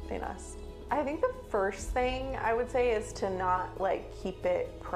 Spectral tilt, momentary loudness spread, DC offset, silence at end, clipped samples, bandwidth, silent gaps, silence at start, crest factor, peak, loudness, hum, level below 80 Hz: -5 dB/octave; 10 LU; under 0.1%; 0 s; under 0.1%; 14.5 kHz; none; 0 s; 16 dB; -16 dBFS; -32 LUFS; none; -44 dBFS